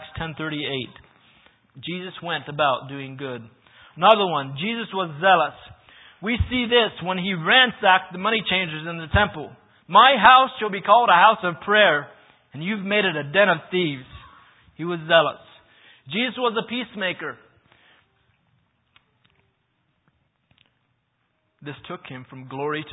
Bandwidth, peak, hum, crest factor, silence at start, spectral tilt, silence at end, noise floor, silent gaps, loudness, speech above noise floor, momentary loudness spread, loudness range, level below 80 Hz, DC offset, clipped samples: 4 kHz; 0 dBFS; none; 22 dB; 0 s; -8 dB/octave; 0 s; -71 dBFS; none; -20 LUFS; 50 dB; 20 LU; 12 LU; -46 dBFS; under 0.1%; under 0.1%